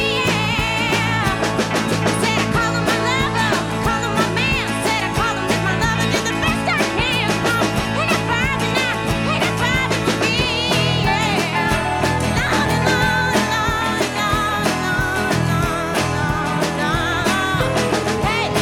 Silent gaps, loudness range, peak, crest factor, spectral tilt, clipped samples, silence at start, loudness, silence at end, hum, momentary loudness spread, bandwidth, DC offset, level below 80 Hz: none; 1 LU; -4 dBFS; 16 dB; -4.5 dB/octave; under 0.1%; 0 s; -18 LUFS; 0 s; none; 2 LU; 18 kHz; under 0.1%; -34 dBFS